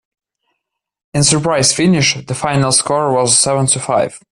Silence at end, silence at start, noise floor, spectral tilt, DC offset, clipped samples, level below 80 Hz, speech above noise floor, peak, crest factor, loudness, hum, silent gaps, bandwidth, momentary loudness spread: 0.15 s; 1.15 s; -75 dBFS; -3.5 dB/octave; under 0.1%; under 0.1%; -48 dBFS; 61 dB; 0 dBFS; 16 dB; -13 LUFS; none; none; 12.5 kHz; 6 LU